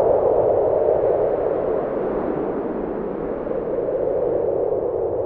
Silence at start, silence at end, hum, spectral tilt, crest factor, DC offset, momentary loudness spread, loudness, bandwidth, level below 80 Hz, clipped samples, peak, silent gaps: 0 s; 0 s; none; -11.5 dB/octave; 16 dB; under 0.1%; 8 LU; -21 LUFS; 3.9 kHz; -44 dBFS; under 0.1%; -6 dBFS; none